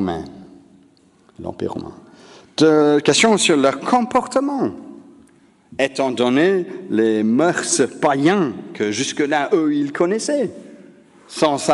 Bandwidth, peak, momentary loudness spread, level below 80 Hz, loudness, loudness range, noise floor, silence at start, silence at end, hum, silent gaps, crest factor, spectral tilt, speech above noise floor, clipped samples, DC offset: 11.5 kHz; -2 dBFS; 15 LU; -58 dBFS; -18 LUFS; 3 LU; -53 dBFS; 0 s; 0 s; none; none; 18 dB; -4 dB/octave; 36 dB; under 0.1%; under 0.1%